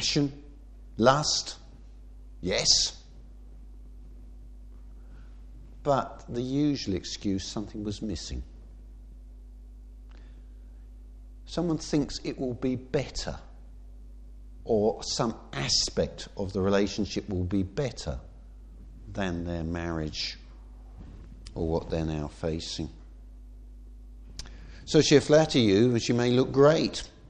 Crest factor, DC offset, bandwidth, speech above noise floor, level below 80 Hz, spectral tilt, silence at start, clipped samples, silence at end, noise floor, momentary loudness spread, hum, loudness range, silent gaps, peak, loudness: 24 dB; under 0.1%; 9.8 kHz; 20 dB; -44 dBFS; -4.5 dB/octave; 0 s; under 0.1%; 0.05 s; -47 dBFS; 23 LU; none; 11 LU; none; -6 dBFS; -27 LUFS